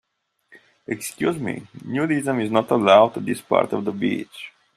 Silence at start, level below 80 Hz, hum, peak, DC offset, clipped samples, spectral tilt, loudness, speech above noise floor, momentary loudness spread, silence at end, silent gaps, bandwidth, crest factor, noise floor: 0.55 s; -66 dBFS; none; -2 dBFS; under 0.1%; under 0.1%; -5.5 dB/octave; -21 LUFS; 41 dB; 16 LU; 0.25 s; none; 14.5 kHz; 20 dB; -62 dBFS